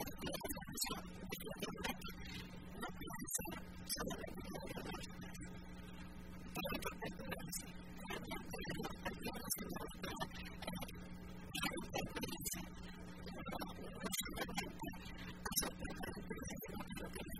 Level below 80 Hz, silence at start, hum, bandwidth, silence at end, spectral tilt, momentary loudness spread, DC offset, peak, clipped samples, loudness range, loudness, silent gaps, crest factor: -58 dBFS; 0 s; none; 16 kHz; 0 s; -3.5 dB/octave; 10 LU; 0.1%; -22 dBFS; under 0.1%; 3 LU; -46 LUFS; none; 24 dB